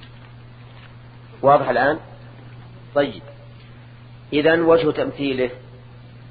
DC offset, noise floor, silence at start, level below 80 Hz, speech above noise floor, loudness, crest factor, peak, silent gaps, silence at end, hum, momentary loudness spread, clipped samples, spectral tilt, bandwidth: under 0.1%; -42 dBFS; 0 s; -52 dBFS; 24 dB; -19 LUFS; 20 dB; -2 dBFS; none; 0.1 s; none; 26 LU; under 0.1%; -9.5 dB/octave; 5 kHz